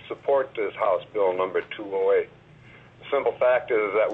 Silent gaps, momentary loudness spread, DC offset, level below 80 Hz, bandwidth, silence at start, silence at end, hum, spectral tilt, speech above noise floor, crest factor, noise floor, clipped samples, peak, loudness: none; 8 LU; under 0.1%; -66 dBFS; 4.1 kHz; 0 s; 0 s; none; -6.5 dB/octave; 26 dB; 14 dB; -50 dBFS; under 0.1%; -12 dBFS; -25 LUFS